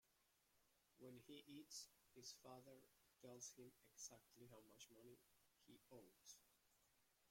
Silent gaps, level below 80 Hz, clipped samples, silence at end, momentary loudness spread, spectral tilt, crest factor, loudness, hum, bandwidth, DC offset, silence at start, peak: none; under -90 dBFS; under 0.1%; 0 s; 10 LU; -2.5 dB/octave; 22 dB; -63 LUFS; none; 16.5 kHz; under 0.1%; 0.05 s; -44 dBFS